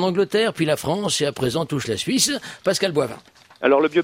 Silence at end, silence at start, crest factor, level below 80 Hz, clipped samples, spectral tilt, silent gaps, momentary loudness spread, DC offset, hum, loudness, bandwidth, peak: 0 s; 0 s; 18 dB; -58 dBFS; under 0.1%; -4 dB/octave; none; 6 LU; under 0.1%; none; -21 LUFS; 16 kHz; -4 dBFS